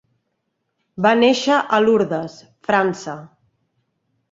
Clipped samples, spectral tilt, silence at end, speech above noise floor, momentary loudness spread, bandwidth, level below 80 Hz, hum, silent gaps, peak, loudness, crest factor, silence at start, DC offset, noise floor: under 0.1%; -5 dB/octave; 1.05 s; 56 dB; 17 LU; 7.8 kHz; -62 dBFS; none; none; -2 dBFS; -17 LUFS; 18 dB; 0.95 s; under 0.1%; -74 dBFS